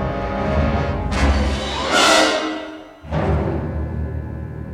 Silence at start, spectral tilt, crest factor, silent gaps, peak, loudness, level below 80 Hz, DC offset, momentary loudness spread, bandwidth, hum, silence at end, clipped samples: 0 s; -4.5 dB/octave; 18 dB; none; -2 dBFS; -19 LUFS; -26 dBFS; under 0.1%; 16 LU; 15 kHz; none; 0 s; under 0.1%